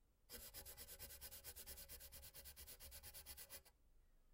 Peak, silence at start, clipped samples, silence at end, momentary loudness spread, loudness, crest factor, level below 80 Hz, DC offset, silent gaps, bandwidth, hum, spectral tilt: -40 dBFS; 0 s; under 0.1%; 0 s; 3 LU; -56 LUFS; 20 dB; -68 dBFS; under 0.1%; none; 16 kHz; none; -1.5 dB/octave